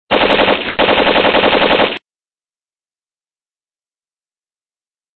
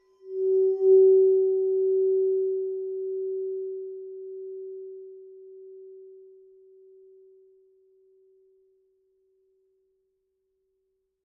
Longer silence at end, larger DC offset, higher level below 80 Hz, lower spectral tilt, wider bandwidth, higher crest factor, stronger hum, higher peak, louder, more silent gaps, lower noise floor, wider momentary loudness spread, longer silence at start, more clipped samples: second, 3.2 s vs 5.1 s; neither; first, -42 dBFS vs under -90 dBFS; second, -6 dB/octave vs -10.5 dB/octave; first, 5.8 kHz vs 0.8 kHz; about the same, 16 dB vs 16 dB; neither; first, 0 dBFS vs -12 dBFS; first, -11 LUFS vs -23 LUFS; neither; first, under -90 dBFS vs -77 dBFS; second, 3 LU vs 28 LU; second, 0.1 s vs 0.25 s; neither